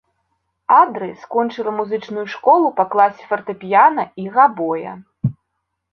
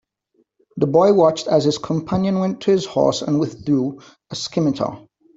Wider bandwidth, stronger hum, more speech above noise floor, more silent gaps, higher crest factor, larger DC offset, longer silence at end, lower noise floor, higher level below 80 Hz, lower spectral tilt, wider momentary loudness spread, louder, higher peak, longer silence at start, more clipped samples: second, 6.4 kHz vs 8 kHz; neither; first, 58 dB vs 46 dB; neither; about the same, 18 dB vs 16 dB; neither; first, 0.6 s vs 0.4 s; first, -75 dBFS vs -65 dBFS; second, -62 dBFS vs -54 dBFS; first, -8 dB/octave vs -6.5 dB/octave; about the same, 12 LU vs 12 LU; about the same, -17 LUFS vs -19 LUFS; about the same, 0 dBFS vs -2 dBFS; about the same, 0.7 s vs 0.75 s; neither